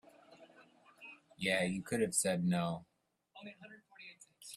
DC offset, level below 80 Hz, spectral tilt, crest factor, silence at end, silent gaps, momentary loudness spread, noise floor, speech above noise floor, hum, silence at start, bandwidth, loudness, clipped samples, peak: under 0.1%; -74 dBFS; -4 dB/octave; 22 dB; 0 s; none; 22 LU; -66 dBFS; 31 dB; none; 0.3 s; 15 kHz; -35 LUFS; under 0.1%; -18 dBFS